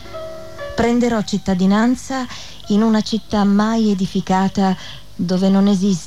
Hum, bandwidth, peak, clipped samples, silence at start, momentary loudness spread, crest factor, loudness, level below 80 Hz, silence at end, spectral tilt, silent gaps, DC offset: none; 11.5 kHz; -4 dBFS; under 0.1%; 0 s; 15 LU; 12 dB; -17 LUFS; -44 dBFS; 0 s; -6 dB/octave; none; 2%